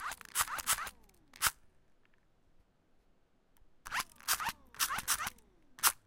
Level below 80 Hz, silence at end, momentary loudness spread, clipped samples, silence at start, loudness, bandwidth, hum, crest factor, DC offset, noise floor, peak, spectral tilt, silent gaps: -62 dBFS; 0.1 s; 9 LU; under 0.1%; 0 s; -35 LUFS; 17 kHz; none; 28 dB; under 0.1%; -69 dBFS; -12 dBFS; 1 dB/octave; none